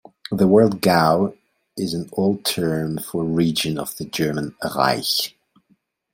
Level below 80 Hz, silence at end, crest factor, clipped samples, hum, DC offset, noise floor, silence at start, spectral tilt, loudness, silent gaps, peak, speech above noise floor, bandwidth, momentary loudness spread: -56 dBFS; 0.85 s; 18 dB; under 0.1%; none; under 0.1%; -63 dBFS; 0.3 s; -5 dB/octave; -20 LUFS; none; -2 dBFS; 44 dB; 16.5 kHz; 12 LU